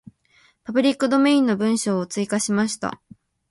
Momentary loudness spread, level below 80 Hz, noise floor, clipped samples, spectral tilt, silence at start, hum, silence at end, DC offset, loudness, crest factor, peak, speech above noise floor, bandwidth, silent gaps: 10 LU; -64 dBFS; -59 dBFS; under 0.1%; -4.5 dB/octave; 0.7 s; none; 0.55 s; under 0.1%; -21 LUFS; 16 dB; -6 dBFS; 39 dB; 11.5 kHz; none